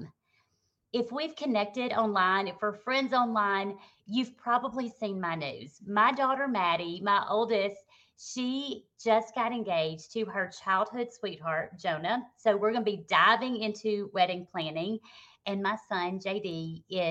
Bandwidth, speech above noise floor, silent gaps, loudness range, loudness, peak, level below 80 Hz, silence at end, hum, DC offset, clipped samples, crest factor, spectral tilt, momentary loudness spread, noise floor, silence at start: 8.6 kHz; 47 dB; none; 3 LU; -30 LUFS; -10 dBFS; -76 dBFS; 0 s; none; under 0.1%; under 0.1%; 20 dB; -5 dB/octave; 10 LU; -77 dBFS; 0 s